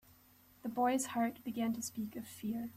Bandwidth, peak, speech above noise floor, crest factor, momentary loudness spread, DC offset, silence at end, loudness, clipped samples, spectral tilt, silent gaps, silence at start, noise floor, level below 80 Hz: 15 kHz; -22 dBFS; 28 dB; 16 dB; 10 LU; under 0.1%; 0 s; -38 LUFS; under 0.1%; -4 dB/octave; none; 0.65 s; -65 dBFS; -74 dBFS